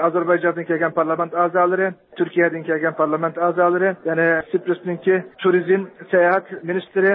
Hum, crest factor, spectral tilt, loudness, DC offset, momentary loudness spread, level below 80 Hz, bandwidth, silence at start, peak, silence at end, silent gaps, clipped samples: none; 14 dB; -11.5 dB/octave; -19 LUFS; under 0.1%; 5 LU; -70 dBFS; 4 kHz; 0 s; -4 dBFS; 0 s; none; under 0.1%